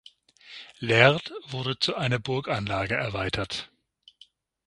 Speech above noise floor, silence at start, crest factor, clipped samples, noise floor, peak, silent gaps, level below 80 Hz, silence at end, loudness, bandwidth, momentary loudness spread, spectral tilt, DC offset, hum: 33 dB; 0.45 s; 26 dB; under 0.1%; -59 dBFS; 0 dBFS; none; -54 dBFS; 1 s; -26 LUFS; 11.5 kHz; 21 LU; -5 dB/octave; under 0.1%; none